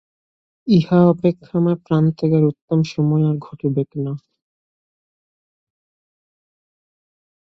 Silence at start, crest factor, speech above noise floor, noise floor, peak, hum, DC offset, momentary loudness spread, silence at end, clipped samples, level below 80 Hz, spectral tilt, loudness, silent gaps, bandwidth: 0.65 s; 18 dB; over 73 dB; under -90 dBFS; -2 dBFS; none; under 0.1%; 11 LU; 3.4 s; under 0.1%; -58 dBFS; -9.5 dB/octave; -18 LUFS; 2.62-2.68 s; 6.4 kHz